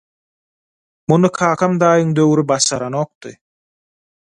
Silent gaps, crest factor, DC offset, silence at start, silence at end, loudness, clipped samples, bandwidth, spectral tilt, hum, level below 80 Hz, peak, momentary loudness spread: 3.15-3.21 s; 18 dB; under 0.1%; 1.1 s; 0.9 s; -15 LUFS; under 0.1%; 11 kHz; -5 dB/octave; none; -58 dBFS; 0 dBFS; 10 LU